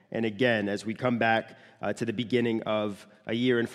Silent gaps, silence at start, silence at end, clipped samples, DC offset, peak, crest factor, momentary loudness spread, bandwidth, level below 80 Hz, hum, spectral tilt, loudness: none; 0.1 s; 0 s; under 0.1%; under 0.1%; -10 dBFS; 18 dB; 10 LU; 12 kHz; -72 dBFS; none; -6 dB/octave; -28 LUFS